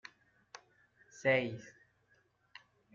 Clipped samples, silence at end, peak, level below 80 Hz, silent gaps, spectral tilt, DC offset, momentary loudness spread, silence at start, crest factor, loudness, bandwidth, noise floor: under 0.1%; 1.25 s; -18 dBFS; -78 dBFS; none; -4 dB/octave; under 0.1%; 26 LU; 1.15 s; 24 dB; -34 LUFS; 7.4 kHz; -73 dBFS